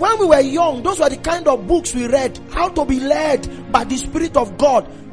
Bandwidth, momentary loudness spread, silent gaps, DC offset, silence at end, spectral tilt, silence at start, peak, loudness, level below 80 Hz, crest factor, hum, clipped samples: 11 kHz; 7 LU; none; 0.9%; 0 s; -4.5 dB/octave; 0 s; 0 dBFS; -17 LUFS; -34 dBFS; 16 dB; none; under 0.1%